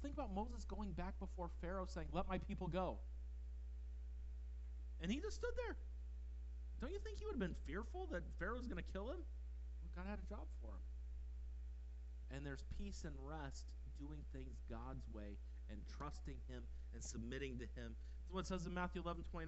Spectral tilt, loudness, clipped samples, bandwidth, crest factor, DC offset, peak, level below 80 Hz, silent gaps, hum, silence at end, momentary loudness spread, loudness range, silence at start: -6 dB/octave; -50 LUFS; under 0.1%; 8 kHz; 20 dB; under 0.1%; -28 dBFS; -50 dBFS; none; none; 0 s; 8 LU; 5 LU; 0 s